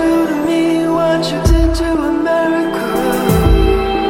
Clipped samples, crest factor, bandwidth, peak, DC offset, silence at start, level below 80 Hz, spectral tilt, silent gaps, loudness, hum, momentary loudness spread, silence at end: under 0.1%; 12 dB; 17 kHz; 0 dBFS; under 0.1%; 0 s; -20 dBFS; -6.5 dB/octave; none; -14 LUFS; none; 4 LU; 0 s